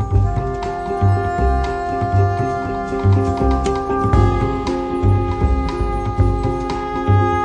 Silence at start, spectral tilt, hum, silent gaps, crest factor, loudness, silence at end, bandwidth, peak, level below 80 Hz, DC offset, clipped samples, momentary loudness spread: 0 s; -8 dB/octave; none; none; 14 dB; -18 LUFS; 0 s; 9.2 kHz; -2 dBFS; -24 dBFS; under 0.1%; under 0.1%; 6 LU